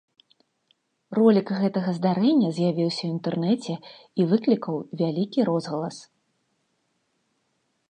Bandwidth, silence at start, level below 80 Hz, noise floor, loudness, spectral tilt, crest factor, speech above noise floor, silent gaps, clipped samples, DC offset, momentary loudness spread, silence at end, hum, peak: 9.6 kHz; 1.1 s; -78 dBFS; -73 dBFS; -24 LUFS; -7.5 dB/octave; 20 dB; 50 dB; none; under 0.1%; under 0.1%; 11 LU; 1.9 s; none; -6 dBFS